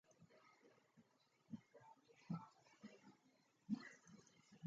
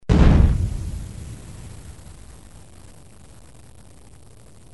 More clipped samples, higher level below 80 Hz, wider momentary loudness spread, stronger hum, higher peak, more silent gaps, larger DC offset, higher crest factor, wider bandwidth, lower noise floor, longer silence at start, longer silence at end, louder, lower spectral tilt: neither; second, under -90 dBFS vs -26 dBFS; second, 18 LU vs 29 LU; neither; second, -32 dBFS vs -2 dBFS; neither; second, under 0.1% vs 0.5%; about the same, 24 dB vs 20 dB; second, 7.6 kHz vs 11.5 kHz; first, -79 dBFS vs -48 dBFS; about the same, 0.1 s vs 0.1 s; second, 0 s vs 2.6 s; second, -55 LUFS vs -19 LUFS; about the same, -6.5 dB/octave vs -7.5 dB/octave